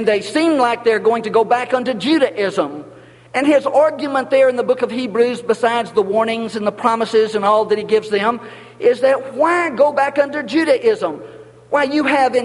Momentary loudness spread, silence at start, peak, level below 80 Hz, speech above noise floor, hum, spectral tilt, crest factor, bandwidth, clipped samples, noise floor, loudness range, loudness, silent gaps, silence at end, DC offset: 6 LU; 0 s; 0 dBFS; -64 dBFS; 23 dB; none; -5 dB/octave; 16 dB; 11.5 kHz; under 0.1%; -39 dBFS; 1 LU; -16 LUFS; none; 0 s; under 0.1%